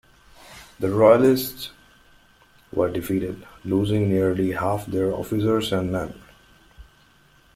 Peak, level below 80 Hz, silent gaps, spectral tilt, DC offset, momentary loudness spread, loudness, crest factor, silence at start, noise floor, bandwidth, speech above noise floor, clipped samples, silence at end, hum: -2 dBFS; -52 dBFS; none; -6.5 dB/octave; under 0.1%; 19 LU; -22 LUFS; 20 dB; 0.5 s; -56 dBFS; 16.5 kHz; 35 dB; under 0.1%; 0.75 s; none